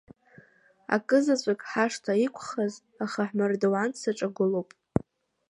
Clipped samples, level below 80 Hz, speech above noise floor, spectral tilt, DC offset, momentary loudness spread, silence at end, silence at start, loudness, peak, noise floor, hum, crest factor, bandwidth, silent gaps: under 0.1%; -60 dBFS; 33 dB; -5.5 dB/octave; under 0.1%; 9 LU; 0.5 s; 0.9 s; -28 LUFS; -8 dBFS; -60 dBFS; none; 20 dB; 11.5 kHz; none